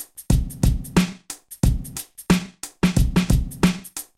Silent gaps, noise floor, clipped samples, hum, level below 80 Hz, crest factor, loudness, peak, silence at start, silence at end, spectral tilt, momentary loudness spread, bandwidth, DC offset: none; -40 dBFS; under 0.1%; none; -26 dBFS; 18 dB; -22 LUFS; -4 dBFS; 0 s; 0.15 s; -5.5 dB/octave; 13 LU; 16.5 kHz; under 0.1%